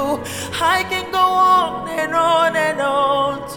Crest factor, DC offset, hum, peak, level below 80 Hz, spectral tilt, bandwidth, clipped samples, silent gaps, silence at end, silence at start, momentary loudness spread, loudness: 14 dB; 0.1%; none; -4 dBFS; -50 dBFS; -3.5 dB/octave; 19.5 kHz; under 0.1%; none; 0 s; 0 s; 8 LU; -17 LUFS